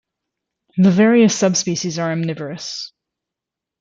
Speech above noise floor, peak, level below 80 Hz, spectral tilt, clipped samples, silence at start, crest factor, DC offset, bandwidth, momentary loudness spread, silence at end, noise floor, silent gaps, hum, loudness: 69 dB; -4 dBFS; -62 dBFS; -5 dB/octave; under 0.1%; 0.75 s; 16 dB; under 0.1%; 7.6 kHz; 15 LU; 0.95 s; -85 dBFS; none; none; -16 LUFS